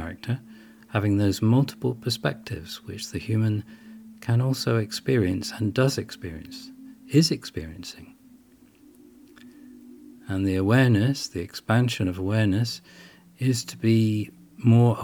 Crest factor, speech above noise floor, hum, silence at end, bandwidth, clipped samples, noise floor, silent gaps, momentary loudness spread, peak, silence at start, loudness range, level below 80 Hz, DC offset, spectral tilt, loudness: 20 dB; 31 dB; none; 0 s; 17.5 kHz; under 0.1%; -55 dBFS; none; 17 LU; -6 dBFS; 0 s; 6 LU; -56 dBFS; under 0.1%; -6 dB/octave; -25 LUFS